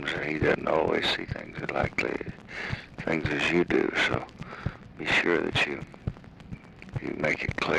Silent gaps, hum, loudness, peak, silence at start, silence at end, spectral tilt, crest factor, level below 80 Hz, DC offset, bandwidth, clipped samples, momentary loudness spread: none; none; -28 LUFS; -12 dBFS; 0 s; 0 s; -5.5 dB/octave; 18 dB; -48 dBFS; under 0.1%; 12 kHz; under 0.1%; 14 LU